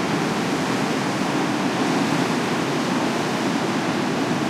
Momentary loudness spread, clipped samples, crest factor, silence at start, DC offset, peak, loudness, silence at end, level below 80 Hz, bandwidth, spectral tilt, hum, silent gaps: 2 LU; under 0.1%; 12 dB; 0 s; under 0.1%; -10 dBFS; -22 LUFS; 0 s; -60 dBFS; 16 kHz; -4.5 dB/octave; none; none